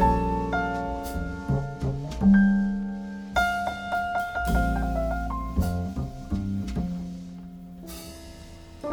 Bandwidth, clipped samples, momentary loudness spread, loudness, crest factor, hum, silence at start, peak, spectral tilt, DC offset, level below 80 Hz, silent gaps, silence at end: 19.5 kHz; under 0.1%; 18 LU; -27 LUFS; 16 dB; none; 0 s; -10 dBFS; -7 dB/octave; under 0.1%; -34 dBFS; none; 0 s